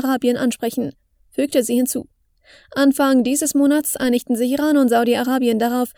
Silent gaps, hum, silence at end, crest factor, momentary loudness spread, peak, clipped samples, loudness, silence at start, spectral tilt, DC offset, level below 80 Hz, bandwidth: none; none; 0.05 s; 14 dB; 9 LU; -4 dBFS; under 0.1%; -18 LUFS; 0 s; -3.5 dB/octave; under 0.1%; -58 dBFS; over 20 kHz